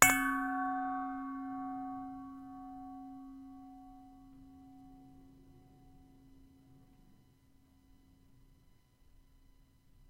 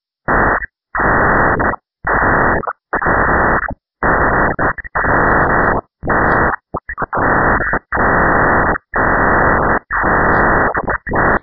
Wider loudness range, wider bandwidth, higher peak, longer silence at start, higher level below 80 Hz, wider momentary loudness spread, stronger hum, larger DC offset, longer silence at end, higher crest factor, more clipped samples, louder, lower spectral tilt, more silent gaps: first, 25 LU vs 2 LU; first, 16 kHz vs 5.2 kHz; about the same, -2 dBFS vs 0 dBFS; second, 0 s vs 0.3 s; second, -64 dBFS vs -26 dBFS; first, 23 LU vs 7 LU; neither; neither; first, 3.3 s vs 0.05 s; first, 38 dB vs 14 dB; neither; second, -37 LUFS vs -14 LUFS; second, -2 dB/octave vs -8 dB/octave; neither